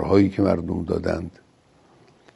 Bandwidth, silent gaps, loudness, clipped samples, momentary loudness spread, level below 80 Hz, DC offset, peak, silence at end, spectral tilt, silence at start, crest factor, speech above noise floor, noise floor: 11.5 kHz; none; -23 LUFS; under 0.1%; 11 LU; -46 dBFS; under 0.1%; -4 dBFS; 1.05 s; -8.5 dB/octave; 0 s; 20 dB; 36 dB; -57 dBFS